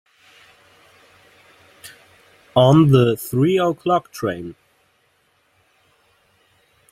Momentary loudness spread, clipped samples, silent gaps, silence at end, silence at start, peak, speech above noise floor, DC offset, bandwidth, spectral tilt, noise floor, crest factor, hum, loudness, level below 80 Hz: 26 LU; under 0.1%; none; 2.4 s; 1.85 s; -2 dBFS; 46 dB; under 0.1%; 16 kHz; -7 dB/octave; -63 dBFS; 20 dB; none; -17 LUFS; -56 dBFS